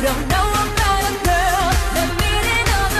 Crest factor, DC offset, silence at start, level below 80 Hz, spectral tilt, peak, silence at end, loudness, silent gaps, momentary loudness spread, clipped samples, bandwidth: 10 dB; under 0.1%; 0 s; -22 dBFS; -3.5 dB/octave; -6 dBFS; 0 s; -17 LUFS; none; 2 LU; under 0.1%; 14 kHz